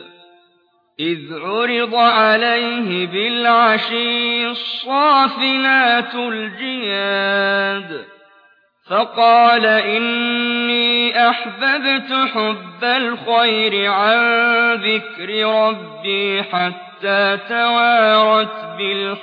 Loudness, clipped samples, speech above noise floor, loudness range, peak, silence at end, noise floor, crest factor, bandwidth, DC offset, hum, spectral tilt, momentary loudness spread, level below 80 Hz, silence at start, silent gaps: -15 LUFS; under 0.1%; 43 dB; 3 LU; -2 dBFS; 0 s; -59 dBFS; 14 dB; 5.2 kHz; under 0.1%; none; -6 dB/octave; 10 LU; -82 dBFS; 0 s; none